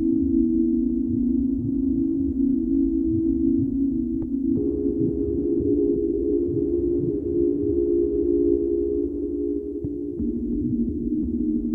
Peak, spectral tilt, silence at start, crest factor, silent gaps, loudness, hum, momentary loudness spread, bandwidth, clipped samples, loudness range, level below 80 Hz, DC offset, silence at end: -10 dBFS; -14 dB/octave; 0 s; 12 dB; none; -23 LUFS; none; 5 LU; 1.2 kHz; under 0.1%; 2 LU; -38 dBFS; under 0.1%; 0 s